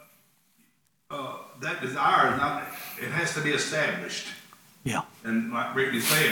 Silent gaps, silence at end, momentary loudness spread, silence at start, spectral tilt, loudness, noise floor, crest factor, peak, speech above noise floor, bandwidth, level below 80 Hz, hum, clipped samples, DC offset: none; 0 s; 15 LU; 1.1 s; -3 dB/octave; -27 LUFS; -68 dBFS; 20 dB; -8 dBFS; 41 dB; over 20 kHz; -66 dBFS; none; under 0.1%; under 0.1%